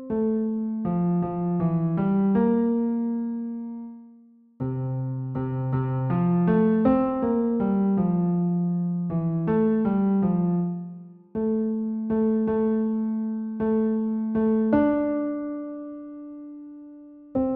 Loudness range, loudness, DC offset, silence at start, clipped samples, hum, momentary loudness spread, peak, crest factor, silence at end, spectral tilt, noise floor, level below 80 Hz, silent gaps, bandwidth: 4 LU; -25 LUFS; under 0.1%; 0 s; under 0.1%; none; 15 LU; -10 dBFS; 14 dB; 0 s; -11 dB/octave; -53 dBFS; -54 dBFS; none; 3.5 kHz